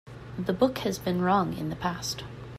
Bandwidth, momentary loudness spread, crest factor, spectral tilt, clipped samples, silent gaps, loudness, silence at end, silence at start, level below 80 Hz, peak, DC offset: 15.5 kHz; 9 LU; 18 dB; -5.5 dB/octave; under 0.1%; none; -28 LUFS; 0 s; 0.05 s; -52 dBFS; -10 dBFS; under 0.1%